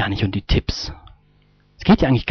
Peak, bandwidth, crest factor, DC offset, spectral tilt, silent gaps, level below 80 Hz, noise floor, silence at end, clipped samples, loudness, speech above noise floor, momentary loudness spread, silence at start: -4 dBFS; 6.6 kHz; 16 dB; under 0.1%; -5.5 dB/octave; none; -30 dBFS; -56 dBFS; 0 s; under 0.1%; -19 LUFS; 38 dB; 13 LU; 0 s